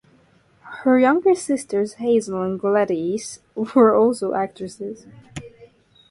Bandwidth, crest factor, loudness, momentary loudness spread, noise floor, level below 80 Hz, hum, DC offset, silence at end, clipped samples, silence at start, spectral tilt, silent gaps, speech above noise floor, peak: 11.5 kHz; 18 dB; -20 LUFS; 22 LU; -56 dBFS; -60 dBFS; none; under 0.1%; 0.45 s; under 0.1%; 0.65 s; -5.5 dB/octave; none; 37 dB; -4 dBFS